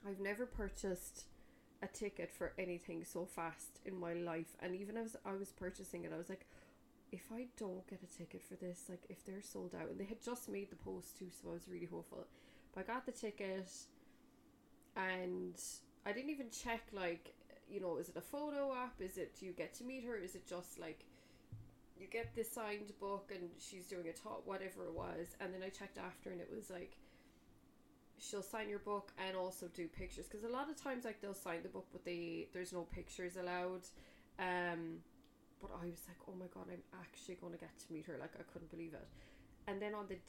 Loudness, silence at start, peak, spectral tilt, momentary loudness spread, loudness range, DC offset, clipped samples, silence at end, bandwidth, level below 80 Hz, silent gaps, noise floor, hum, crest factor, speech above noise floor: -48 LUFS; 0 s; -28 dBFS; -4.5 dB/octave; 11 LU; 6 LU; under 0.1%; under 0.1%; 0 s; 16.5 kHz; -66 dBFS; none; -69 dBFS; none; 20 dB; 21 dB